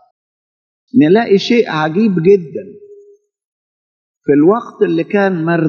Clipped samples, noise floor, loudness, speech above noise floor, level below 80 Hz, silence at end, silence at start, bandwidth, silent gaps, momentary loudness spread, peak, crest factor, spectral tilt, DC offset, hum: under 0.1%; -45 dBFS; -12 LUFS; 33 dB; -66 dBFS; 0 s; 0.95 s; 7 kHz; 3.45-4.21 s; 6 LU; 0 dBFS; 14 dB; -7.5 dB/octave; under 0.1%; none